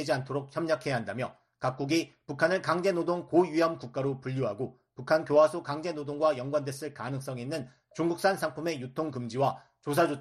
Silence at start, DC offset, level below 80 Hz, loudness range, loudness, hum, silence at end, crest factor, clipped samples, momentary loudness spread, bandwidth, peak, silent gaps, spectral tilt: 0 s; under 0.1%; -70 dBFS; 4 LU; -30 LUFS; none; 0 s; 18 dB; under 0.1%; 11 LU; 13 kHz; -10 dBFS; none; -6 dB/octave